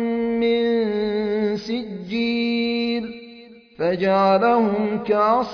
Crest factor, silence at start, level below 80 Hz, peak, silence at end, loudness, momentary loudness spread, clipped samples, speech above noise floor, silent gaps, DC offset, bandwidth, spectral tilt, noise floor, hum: 14 dB; 0 s; -56 dBFS; -6 dBFS; 0 s; -21 LUFS; 10 LU; under 0.1%; 26 dB; none; under 0.1%; 5.4 kHz; -7 dB/octave; -44 dBFS; none